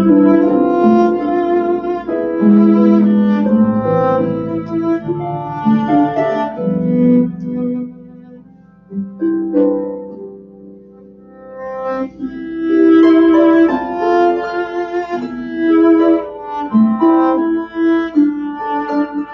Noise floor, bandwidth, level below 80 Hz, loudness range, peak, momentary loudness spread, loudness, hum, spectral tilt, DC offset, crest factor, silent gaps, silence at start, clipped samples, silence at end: -43 dBFS; 6 kHz; -50 dBFS; 9 LU; 0 dBFS; 14 LU; -14 LUFS; none; -9.5 dB/octave; under 0.1%; 14 dB; none; 0 s; under 0.1%; 0 s